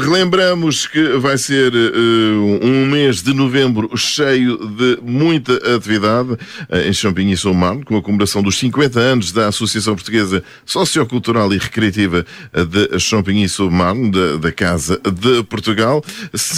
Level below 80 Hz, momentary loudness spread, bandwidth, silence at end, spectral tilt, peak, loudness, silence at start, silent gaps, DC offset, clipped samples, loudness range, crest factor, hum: -42 dBFS; 5 LU; 16 kHz; 0 s; -4.5 dB/octave; -2 dBFS; -15 LUFS; 0 s; none; under 0.1%; under 0.1%; 2 LU; 14 dB; none